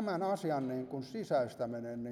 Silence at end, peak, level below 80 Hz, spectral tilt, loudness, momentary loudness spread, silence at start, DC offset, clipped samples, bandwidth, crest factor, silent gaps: 0 s; -20 dBFS; -76 dBFS; -7 dB/octave; -37 LUFS; 7 LU; 0 s; under 0.1%; under 0.1%; 14.5 kHz; 16 dB; none